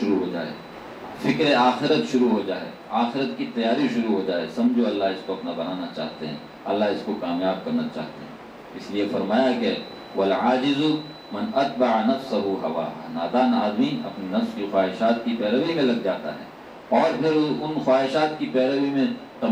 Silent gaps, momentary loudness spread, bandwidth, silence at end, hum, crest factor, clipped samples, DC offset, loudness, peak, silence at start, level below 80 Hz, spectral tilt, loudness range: none; 13 LU; 15.5 kHz; 0 s; none; 18 dB; under 0.1%; under 0.1%; -24 LUFS; -6 dBFS; 0 s; -64 dBFS; -6 dB/octave; 4 LU